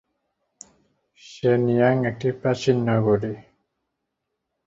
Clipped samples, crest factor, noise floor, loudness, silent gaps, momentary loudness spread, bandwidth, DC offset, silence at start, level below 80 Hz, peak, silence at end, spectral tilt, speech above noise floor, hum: under 0.1%; 20 dB; -80 dBFS; -22 LUFS; none; 7 LU; 8 kHz; under 0.1%; 1.25 s; -58 dBFS; -4 dBFS; 1.25 s; -7.5 dB/octave; 59 dB; none